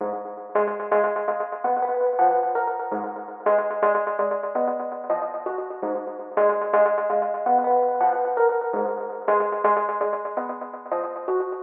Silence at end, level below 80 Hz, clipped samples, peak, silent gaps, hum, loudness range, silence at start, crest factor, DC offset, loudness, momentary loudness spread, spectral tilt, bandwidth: 0 s; under -90 dBFS; under 0.1%; -8 dBFS; none; none; 3 LU; 0 s; 14 dB; under 0.1%; -24 LUFS; 9 LU; -9.5 dB/octave; 3.4 kHz